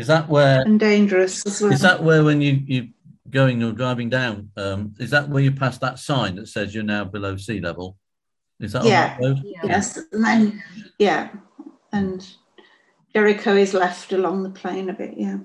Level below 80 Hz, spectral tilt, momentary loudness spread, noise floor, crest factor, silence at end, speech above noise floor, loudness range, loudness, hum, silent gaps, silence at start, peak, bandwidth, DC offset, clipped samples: -52 dBFS; -6 dB/octave; 13 LU; -84 dBFS; 18 dB; 0 s; 64 dB; 6 LU; -20 LUFS; none; none; 0 s; -2 dBFS; 12 kHz; under 0.1%; under 0.1%